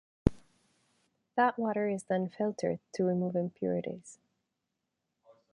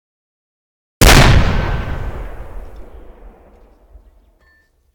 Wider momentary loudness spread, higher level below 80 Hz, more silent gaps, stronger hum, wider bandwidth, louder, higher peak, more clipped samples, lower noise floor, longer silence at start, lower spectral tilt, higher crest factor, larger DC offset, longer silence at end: second, 7 LU vs 27 LU; second, -50 dBFS vs -20 dBFS; neither; neither; second, 11 kHz vs 19 kHz; second, -33 LUFS vs -12 LUFS; second, -6 dBFS vs 0 dBFS; neither; first, -85 dBFS vs -55 dBFS; second, 0.25 s vs 1 s; first, -7.5 dB/octave vs -4 dB/octave; first, 28 dB vs 16 dB; neither; first, 1.4 s vs 0 s